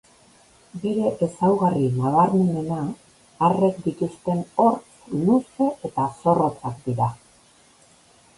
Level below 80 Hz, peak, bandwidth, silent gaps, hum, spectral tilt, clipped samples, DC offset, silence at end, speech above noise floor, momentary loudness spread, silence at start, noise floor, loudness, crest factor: -58 dBFS; -4 dBFS; 11.5 kHz; none; none; -8.5 dB/octave; under 0.1%; under 0.1%; 1.2 s; 34 dB; 10 LU; 0.75 s; -55 dBFS; -22 LUFS; 18 dB